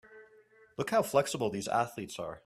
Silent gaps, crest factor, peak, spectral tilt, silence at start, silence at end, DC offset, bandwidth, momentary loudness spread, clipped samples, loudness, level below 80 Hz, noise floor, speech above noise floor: none; 20 dB; -14 dBFS; -4.5 dB/octave; 0.1 s; 0.1 s; under 0.1%; 15.5 kHz; 12 LU; under 0.1%; -32 LUFS; -70 dBFS; -62 dBFS; 30 dB